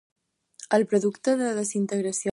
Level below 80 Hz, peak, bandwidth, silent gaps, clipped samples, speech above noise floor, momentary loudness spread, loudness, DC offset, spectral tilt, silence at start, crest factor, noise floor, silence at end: -70 dBFS; -8 dBFS; 11.5 kHz; none; under 0.1%; 25 dB; 4 LU; -25 LUFS; under 0.1%; -5 dB/octave; 0.6 s; 18 dB; -49 dBFS; 0.05 s